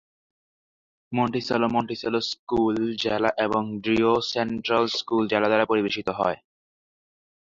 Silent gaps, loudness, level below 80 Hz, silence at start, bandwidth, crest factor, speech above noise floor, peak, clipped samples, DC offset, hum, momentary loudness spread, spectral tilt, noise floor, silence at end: 2.39-2.47 s; -24 LUFS; -58 dBFS; 1.1 s; 7.6 kHz; 20 dB; over 66 dB; -6 dBFS; under 0.1%; under 0.1%; none; 6 LU; -5.5 dB/octave; under -90 dBFS; 1.2 s